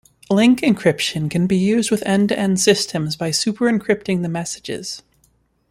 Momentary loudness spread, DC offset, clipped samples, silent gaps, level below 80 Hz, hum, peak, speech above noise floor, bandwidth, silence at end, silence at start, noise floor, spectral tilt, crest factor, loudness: 11 LU; under 0.1%; under 0.1%; none; -54 dBFS; none; -2 dBFS; 43 dB; 15.5 kHz; 0.7 s; 0.3 s; -61 dBFS; -4.5 dB/octave; 18 dB; -18 LUFS